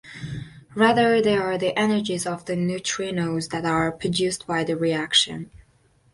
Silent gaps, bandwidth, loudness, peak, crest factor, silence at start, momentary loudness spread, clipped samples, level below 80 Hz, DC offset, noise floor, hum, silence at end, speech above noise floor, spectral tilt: none; 11.5 kHz; -22 LUFS; -4 dBFS; 20 dB; 0.05 s; 16 LU; under 0.1%; -54 dBFS; under 0.1%; -60 dBFS; none; 0.55 s; 38 dB; -4 dB/octave